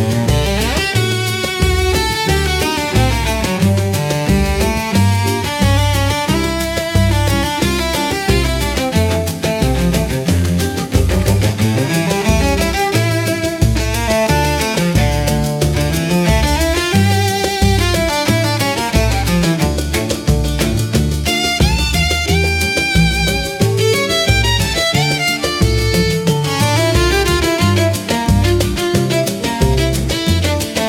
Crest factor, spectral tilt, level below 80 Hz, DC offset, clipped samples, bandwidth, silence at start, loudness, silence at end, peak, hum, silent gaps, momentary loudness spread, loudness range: 14 dB; -4.5 dB/octave; -22 dBFS; under 0.1%; under 0.1%; 17.5 kHz; 0 s; -15 LUFS; 0 s; 0 dBFS; none; none; 3 LU; 2 LU